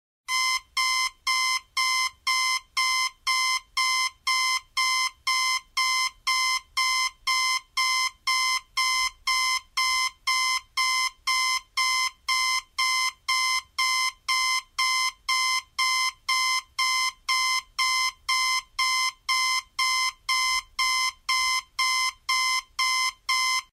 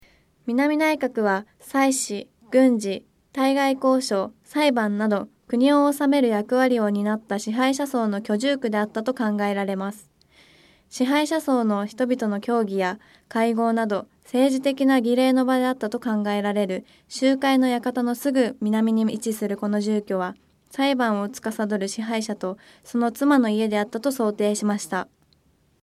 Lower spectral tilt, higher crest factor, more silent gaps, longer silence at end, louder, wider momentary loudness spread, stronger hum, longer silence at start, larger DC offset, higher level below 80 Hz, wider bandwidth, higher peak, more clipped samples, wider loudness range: second, 5.5 dB/octave vs -5 dB/octave; about the same, 14 dB vs 16 dB; neither; second, 0.1 s vs 0.8 s; about the same, -24 LUFS vs -23 LUFS; second, 2 LU vs 10 LU; neither; second, 0.3 s vs 0.45 s; neither; first, -62 dBFS vs -68 dBFS; about the same, 16 kHz vs 15 kHz; second, -12 dBFS vs -6 dBFS; neither; second, 0 LU vs 4 LU